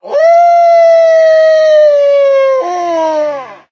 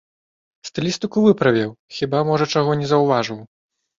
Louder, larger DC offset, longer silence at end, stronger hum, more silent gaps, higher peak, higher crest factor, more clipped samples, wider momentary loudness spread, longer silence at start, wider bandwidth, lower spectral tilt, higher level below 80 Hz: first, -8 LUFS vs -19 LUFS; neither; second, 0.15 s vs 0.55 s; neither; second, none vs 1.79-1.89 s; about the same, 0 dBFS vs -2 dBFS; second, 8 dB vs 18 dB; neither; second, 8 LU vs 12 LU; second, 0.05 s vs 0.65 s; second, 6.8 kHz vs 7.6 kHz; second, -2.5 dB/octave vs -6 dB/octave; second, -72 dBFS vs -58 dBFS